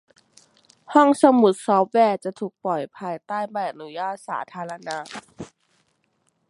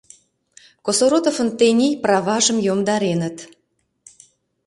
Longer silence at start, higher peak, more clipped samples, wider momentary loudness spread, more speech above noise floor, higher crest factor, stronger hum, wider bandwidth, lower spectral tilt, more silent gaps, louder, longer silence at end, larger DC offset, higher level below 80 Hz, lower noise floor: about the same, 0.9 s vs 0.85 s; about the same, -2 dBFS vs -2 dBFS; neither; first, 18 LU vs 9 LU; about the same, 48 dB vs 51 dB; about the same, 22 dB vs 18 dB; neither; about the same, 11.5 kHz vs 11.5 kHz; first, -5.5 dB/octave vs -4 dB/octave; neither; second, -22 LUFS vs -18 LUFS; second, 1.05 s vs 1.2 s; neither; second, -72 dBFS vs -64 dBFS; about the same, -69 dBFS vs -69 dBFS